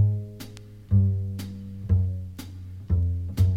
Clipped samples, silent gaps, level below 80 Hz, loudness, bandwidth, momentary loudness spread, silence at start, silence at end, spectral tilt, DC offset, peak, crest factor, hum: under 0.1%; none; -38 dBFS; -27 LUFS; 14.5 kHz; 17 LU; 0 s; 0 s; -8.5 dB/octave; under 0.1%; -10 dBFS; 16 dB; none